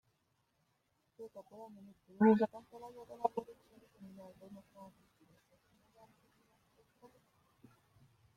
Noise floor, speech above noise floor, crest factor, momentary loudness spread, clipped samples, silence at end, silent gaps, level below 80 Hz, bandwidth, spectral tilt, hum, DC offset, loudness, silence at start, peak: -80 dBFS; 42 dB; 26 dB; 29 LU; under 0.1%; 3.55 s; none; -80 dBFS; 6.8 kHz; -8.5 dB/octave; none; under 0.1%; -34 LUFS; 1.2 s; -16 dBFS